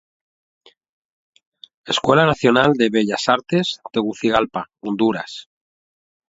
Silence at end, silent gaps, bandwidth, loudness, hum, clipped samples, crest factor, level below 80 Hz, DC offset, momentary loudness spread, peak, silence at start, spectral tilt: 0.9 s; none; 8 kHz; -18 LUFS; none; under 0.1%; 20 dB; -54 dBFS; under 0.1%; 13 LU; 0 dBFS; 1.85 s; -5 dB/octave